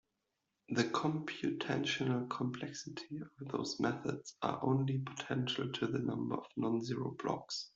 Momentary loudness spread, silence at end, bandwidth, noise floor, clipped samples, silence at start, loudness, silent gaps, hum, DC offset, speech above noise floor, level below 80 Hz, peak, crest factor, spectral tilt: 8 LU; 0.1 s; 7.8 kHz; -86 dBFS; under 0.1%; 0.7 s; -38 LUFS; none; none; under 0.1%; 48 dB; -74 dBFS; -18 dBFS; 20 dB; -5.5 dB/octave